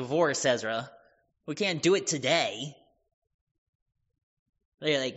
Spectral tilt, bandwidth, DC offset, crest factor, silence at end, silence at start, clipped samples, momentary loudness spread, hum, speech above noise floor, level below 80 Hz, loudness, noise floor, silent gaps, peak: -2.5 dB/octave; 8 kHz; under 0.1%; 20 dB; 0 s; 0 s; under 0.1%; 15 LU; none; 37 dB; -74 dBFS; -28 LUFS; -65 dBFS; 3.14-3.22 s, 3.34-3.86 s, 4.23-4.53 s, 4.65-4.78 s; -10 dBFS